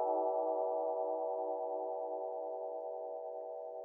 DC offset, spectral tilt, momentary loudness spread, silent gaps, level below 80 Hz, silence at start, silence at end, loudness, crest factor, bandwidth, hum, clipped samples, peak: under 0.1%; -5.5 dB/octave; 9 LU; none; under -90 dBFS; 0 s; 0 s; -39 LUFS; 14 dB; 1.9 kHz; none; under 0.1%; -24 dBFS